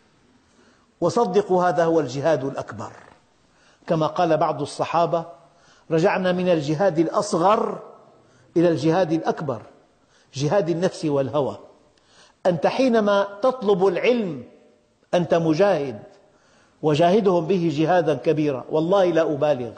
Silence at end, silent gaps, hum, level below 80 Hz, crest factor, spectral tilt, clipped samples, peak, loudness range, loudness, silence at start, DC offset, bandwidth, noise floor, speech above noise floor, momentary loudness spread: 0 s; none; none; -64 dBFS; 14 dB; -6.5 dB/octave; under 0.1%; -8 dBFS; 4 LU; -21 LUFS; 1 s; under 0.1%; 9.2 kHz; -59 dBFS; 38 dB; 10 LU